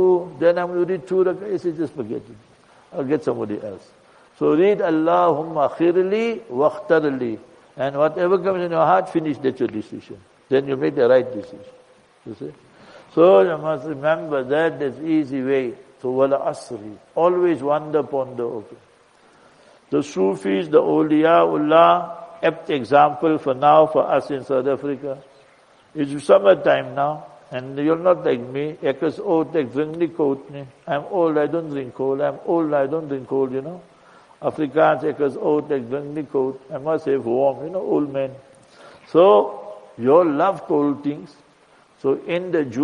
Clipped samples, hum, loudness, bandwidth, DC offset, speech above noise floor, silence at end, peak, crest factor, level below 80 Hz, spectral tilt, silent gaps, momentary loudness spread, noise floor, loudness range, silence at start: under 0.1%; none; -20 LUFS; 10.5 kHz; under 0.1%; 34 dB; 0 s; -2 dBFS; 18 dB; -66 dBFS; -7 dB/octave; none; 14 LU; -54 dBFS; 6 LU; 0 s